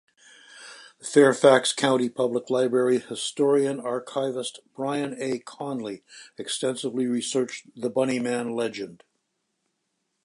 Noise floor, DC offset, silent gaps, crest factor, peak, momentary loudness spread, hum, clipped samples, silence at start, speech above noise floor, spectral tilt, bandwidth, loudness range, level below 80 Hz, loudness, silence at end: -77 dBFS; under 0.1%; none; 22 dB; -4 dBFS; 18 LU; none; under 0.1%; 0.55 s; 53 dB; -4 dB/octave; 11.5 kHz; 8 LU; -78 dBFS; -25 LUFS; 1.3 s